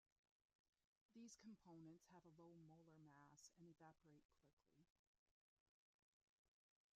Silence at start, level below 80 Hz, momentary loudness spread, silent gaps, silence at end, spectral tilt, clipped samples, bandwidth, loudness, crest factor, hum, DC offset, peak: 1.1 s; under -90 dBFS; 5 LU; 4.25-4.29 s, 4.53-4.57 s, 4.90-6.45 s; 0.45 s; -6 dB/octave; under 0.1%; 7.2 kHz; -67 LUFS; 18 dB; none; under 0.1%; -54 dBFS